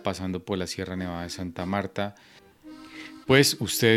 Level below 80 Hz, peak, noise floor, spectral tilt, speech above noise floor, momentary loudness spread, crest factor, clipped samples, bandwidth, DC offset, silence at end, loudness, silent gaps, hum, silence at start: -56 dBFS; -4 dBFS; -47 dBFS; -4 dB/octave; 21 dB; 22 LU; 24 dB; under 0.1%; 16.5 kHz; under 0.1%; 0 s; -26 LUFS; none; none; 0 s